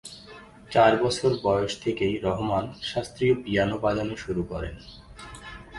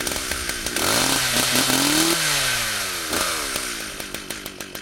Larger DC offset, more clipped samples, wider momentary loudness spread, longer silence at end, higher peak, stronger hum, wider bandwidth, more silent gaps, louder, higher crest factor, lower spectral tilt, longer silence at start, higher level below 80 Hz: neither; neither; first, 22 LU vs 13 LU; about the same, 0 s vs 0 s; second, -6 dBFS vs -2 dBFS; neither; second, 11.5 kHz vs 17.5 kHz; neither; second, -25 LUFS vs -20 LUFS; about the same, 20 dB vs 20 dB; first, -5.5 dB/octave vs -1.5 dB/octave; about the same, 0.05 s vs 0 s; about the same, -48 dBFS vs -44 dBFS